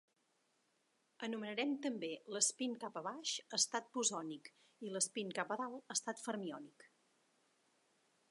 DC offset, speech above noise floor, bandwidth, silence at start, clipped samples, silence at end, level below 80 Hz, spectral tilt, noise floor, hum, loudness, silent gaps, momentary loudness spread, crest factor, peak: under 0.1%; 38 dB; 11.5 kHz; 1.2 s; under 0.1%; 1.45 s; under -90 dBFS; -1.5 dB/octave; -80 dBFS; none; -40 LUFS; none; 13 LU; 24 dB; -20 dBFS